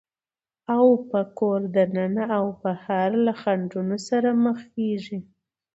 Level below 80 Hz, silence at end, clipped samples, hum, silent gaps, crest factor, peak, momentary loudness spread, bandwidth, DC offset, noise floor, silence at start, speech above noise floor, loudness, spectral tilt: -70 dBFS; 0.55 s; under 0.1%; none; none; 18 dB; -6 dBFS; 9 LU; 8 kHz; under 0.1%; under -90 dBFS; 0.7 s; over 66 dB; -23 LUFS; -7.5 dB/octave